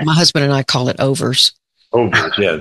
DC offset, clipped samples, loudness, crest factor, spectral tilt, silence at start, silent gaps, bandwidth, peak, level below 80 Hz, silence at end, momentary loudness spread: under 0.1%; under 0.1%; -14 LUFS; 14 dB; -4 dB/octave; 0 s; none; 12.5 kHz; 0 dBFS; -50 dBFS; 0 s; 5 LU